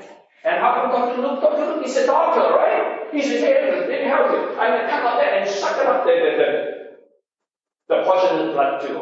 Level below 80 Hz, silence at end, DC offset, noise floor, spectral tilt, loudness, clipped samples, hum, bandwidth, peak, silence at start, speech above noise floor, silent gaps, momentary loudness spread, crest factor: -90 dBFS; 0 s; under 0.1%; -86 dBFS; -3.5 dB/octave; -19 LUFS; under 0.1%; none; 8 kHz; -2 dBFS; 0 s; 67 dB; none; 6 LU; 16 dB